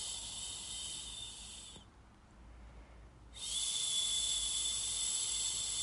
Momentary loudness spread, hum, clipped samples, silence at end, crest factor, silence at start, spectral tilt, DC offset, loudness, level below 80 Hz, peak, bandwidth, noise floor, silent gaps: 19 LU; none; under 0.1%; 0 s; 18 dB; 0 s; 1 dB/octave; under 0.1%; -35 LUFS; -58 dBFS; -22 dBFS; 11.5 kHz; -60 dBFS; none